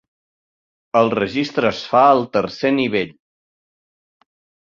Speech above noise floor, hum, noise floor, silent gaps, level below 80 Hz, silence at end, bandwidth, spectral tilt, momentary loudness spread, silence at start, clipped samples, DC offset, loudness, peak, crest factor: over 73 dB; none; under -90 dBFS; none; -58 dBFS; 1.6 s; 7.4 kHz; -6 dB/octave; 8 LU; 0.95 s; under 0.1%; under 0.1%; -17 LUFS; -2 dBFS; 18 dB